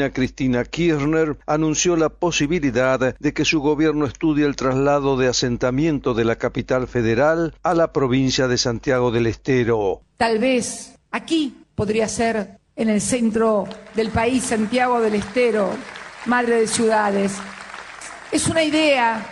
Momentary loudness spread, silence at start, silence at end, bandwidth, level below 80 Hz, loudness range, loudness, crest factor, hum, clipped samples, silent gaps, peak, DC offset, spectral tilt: 7 LU; 0 s; 0 s; 12.5 kHz; -44 dBFS; 2 LU; -20 LUFS; 14 dB; none; under 0.1%; none; -6 dBFS; under 0.1%; -4.5 dB/octave